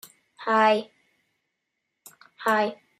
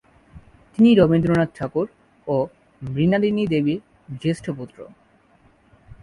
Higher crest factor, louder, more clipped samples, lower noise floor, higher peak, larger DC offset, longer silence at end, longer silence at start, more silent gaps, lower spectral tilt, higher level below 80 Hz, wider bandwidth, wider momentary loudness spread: about the same, 20 dB vs 18 dB; second, -24 LUFS vs -21 LUFS; neither; first, -80 dBFS vs -57 dBFS; second, -8 dBFS vs -4 dBFS; neither; second, 0.25 s vs 1.2 s; about the same, 0.4 s vs 0.35 s; neither; second, -4 dB/octave vs -8 dB/octave; second, -82 dBFS vs -50 dBFS; first, 15 kHz vs 11 kHz; second, 9 LU vs 18 LU